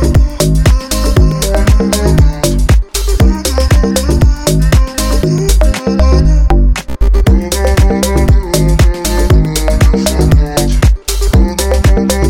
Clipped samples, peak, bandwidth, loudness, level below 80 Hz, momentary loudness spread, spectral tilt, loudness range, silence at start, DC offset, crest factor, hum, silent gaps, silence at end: under 0.1%; 0 dBFS; 17 kHz; -11 LUFS; -10 dBFS; 3 LU; -5.5 dB/octave; 1 LU; 0 s; under 0.1%; 8 dB; none; none; 0 s